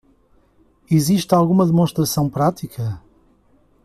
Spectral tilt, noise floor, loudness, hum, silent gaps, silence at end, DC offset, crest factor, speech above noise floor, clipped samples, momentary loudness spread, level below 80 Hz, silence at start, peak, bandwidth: -6.5 dB/octave; -56 dBFS; -18 LUFS; none; none; 0.85 s; under 0.1%; 16 dB; 39 dB; under 0.1%; 12 LU; -50 dBFS; 0.9 s; -4 dBFS; 15 kHz